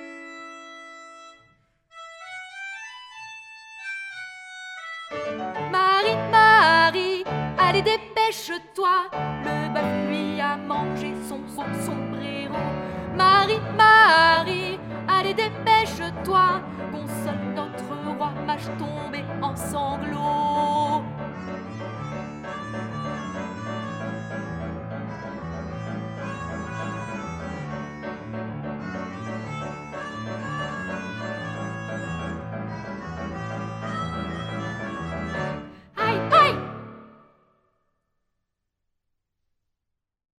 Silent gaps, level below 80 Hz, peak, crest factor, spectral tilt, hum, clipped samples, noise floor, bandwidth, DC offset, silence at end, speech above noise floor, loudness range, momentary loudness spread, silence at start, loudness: none; -52 dBFS; -4 dBFS; 22 dB; -5 dB/octave; none; under 0.1%; -82 dBFS; 16 kHz; under 0.1%; 3.3 s; 61 dB; 14 LU; 18 LU; 0 s; -24 LUFS